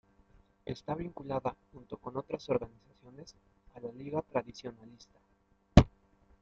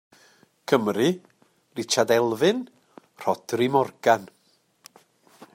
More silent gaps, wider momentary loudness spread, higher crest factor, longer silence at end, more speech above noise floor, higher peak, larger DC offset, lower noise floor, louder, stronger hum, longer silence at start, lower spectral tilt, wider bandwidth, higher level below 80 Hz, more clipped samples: neither; first, 28 LU vs 15 LU; first, 32 dB vs 20 dB; second, 0.55 s vs 1.3 s; second, 26 dB vs 41 dB; about the same, -2 dBFS vs -4 dBFS; neither; about the same, -66 dBFS vs -64 dBFS; second, -33 LUFS vs -24 LUFS; neither; about the same, 0.65 s vs 0.7 s; first, -7 dB/octave vs -4.5 dB/octave; second, 7.8 kHz vs 16 kHz; first, -46 dBFS vs -72 dBFS; neither